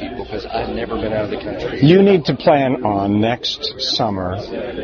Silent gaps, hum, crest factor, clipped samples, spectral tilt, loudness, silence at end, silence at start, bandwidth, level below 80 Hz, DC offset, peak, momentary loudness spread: none; none; 16 dB; under 0.1%; -6.5 dB/octave; -17 LUFS; 0 s; 0 s; 7 kHz; -40 dBFS; under 0.1%; 0 dBFS; 13 LU